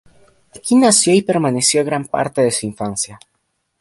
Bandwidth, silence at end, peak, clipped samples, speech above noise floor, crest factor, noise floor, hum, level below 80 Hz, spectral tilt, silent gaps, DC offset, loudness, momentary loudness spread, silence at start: 11.5 kHz; 0.65 s; 0 dBFS; under 0.1%; 53 dB; 16 dB; -69 dBFS; none; -56 dBFS; -3.5 dB/octave; none; under 0.1%; -15 LUFS; 12 LU; 0.55 s